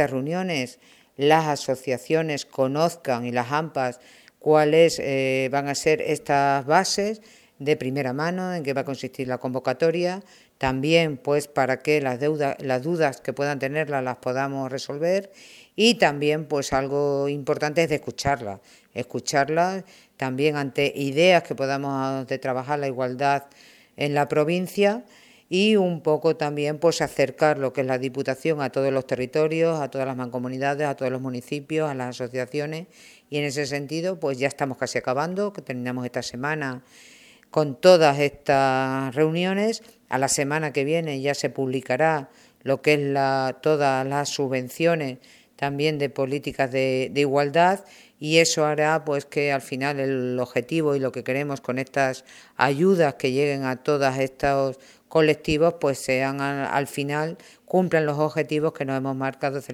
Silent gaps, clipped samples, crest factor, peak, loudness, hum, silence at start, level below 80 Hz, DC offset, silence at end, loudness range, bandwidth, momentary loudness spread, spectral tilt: none; under 0.1%; 22 dB; -2 dBFS; -24 LUFS; none; 0 s; -58 dBFS; under 0.1%; 0 s; 5 LU; 16 kHz; 9 LU; -5 dB/octave